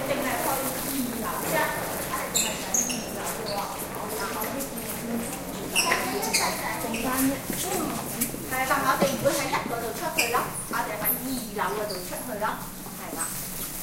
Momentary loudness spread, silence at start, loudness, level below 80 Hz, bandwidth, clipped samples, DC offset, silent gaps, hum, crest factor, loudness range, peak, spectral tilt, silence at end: 8 LU; 0 s; -27 LUFS; -50 dBFS; 16.5 kHz; under 0.1%; under 0.1%; none; none; 22 dB; 3 LU; -8 dBFS; -2.5 dB/octave; 0 s